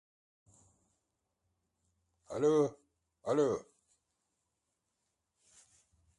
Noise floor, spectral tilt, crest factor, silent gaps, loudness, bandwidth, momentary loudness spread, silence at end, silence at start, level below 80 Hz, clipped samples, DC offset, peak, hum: -85 dBFS; -6.5 dB/octave; 20 dB; none; -33 LUFS; 11 kHz; 14 LU; 2.55 s; 2.3 s; -76 dBFS; under 0.1%; under 0.1%; -18 dBFS; none